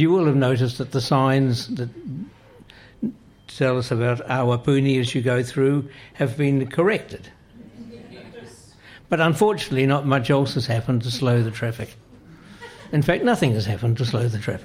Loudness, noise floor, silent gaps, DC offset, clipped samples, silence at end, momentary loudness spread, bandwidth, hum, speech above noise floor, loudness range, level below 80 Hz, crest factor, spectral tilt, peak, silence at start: -21 LUFS; -48 dBFS; none; under 0.1%; under 0.1%; 0 s; 21 LU; 15 kHz; none; 27 dB; 4 LU; -52 dBFS; 16 dB; -6.5 dB/octave; -6 dBFS; 0 s